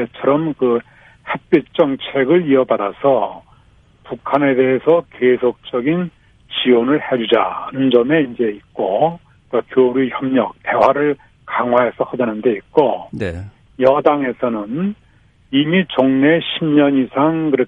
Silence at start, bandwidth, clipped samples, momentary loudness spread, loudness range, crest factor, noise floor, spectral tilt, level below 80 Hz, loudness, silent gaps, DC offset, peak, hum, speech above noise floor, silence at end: 0 s; 5.2 kHz; under 0.1%; 10 LU; 2 LU; 16 dB; -51 dBFS; -8.5 dB/octave; -52 dBFS; -16 LUFS; none; under 0.1%; 0 dBFS; none; 36 dB; 0 s